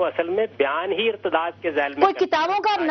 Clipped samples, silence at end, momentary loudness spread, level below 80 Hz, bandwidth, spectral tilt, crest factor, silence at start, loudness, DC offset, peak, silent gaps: under 0.1%; 0 s; 4 LU; -66 dBFS; 6.4 kHz; -4.5 dB/octave; 20 dB; 0 s; -22 LUFS; under 0.1%; -2 dBFS; none